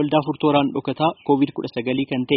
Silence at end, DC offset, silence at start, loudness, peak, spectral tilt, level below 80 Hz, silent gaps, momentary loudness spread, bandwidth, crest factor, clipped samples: 0 s; under 0.1%; 0 s; -21 LUFS; -4 dBFS; -5 dB/octave; -60 dBFS; none; 5 LU; 5.4 kHz; 18 dB; under 0.1%